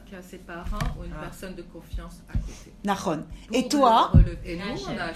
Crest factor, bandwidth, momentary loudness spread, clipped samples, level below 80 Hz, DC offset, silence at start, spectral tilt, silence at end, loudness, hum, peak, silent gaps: 22 dB; 14 kHz; 21 LU; under 0.1%; -32 dBFS; under 0.1%; 0 s; -6 dB/octave; 0 s; -25 LUFS; none; -4 dBFS; none